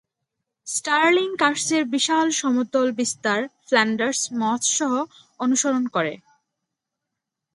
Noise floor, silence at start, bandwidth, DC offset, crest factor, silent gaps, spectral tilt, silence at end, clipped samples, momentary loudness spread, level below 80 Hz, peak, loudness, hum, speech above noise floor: -83 dBFS; 0.65 s; 11.5 kHz; under 0.1%; 20 dB; none; -2 dB/octave; 1.35 s; under 0.1%; 8 LU; -74 dBFS; -4 dBFS; -21 LUFS; none; 62 dB